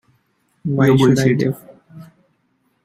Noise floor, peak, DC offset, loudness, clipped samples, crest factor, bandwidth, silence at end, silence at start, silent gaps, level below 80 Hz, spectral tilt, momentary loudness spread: -65 dBFS; -2 dBFS; under 0.1%; -15 LUFS; under 0.1%; 16 dB; 15.5 kHz; 0.85 s; 0.65 s; none; -54 dBFS; -7 dB/octave; 15 LU